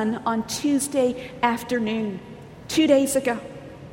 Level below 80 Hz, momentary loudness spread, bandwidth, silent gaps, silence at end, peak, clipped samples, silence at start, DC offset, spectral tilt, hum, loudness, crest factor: -56 dBFS; 20 LU; 16.5 kHz; none; 0 s; -6 dBFS; under 0.1%; 0 s; under 0.1%; -4 dB/octave; none; -23 LUFS; 18 dB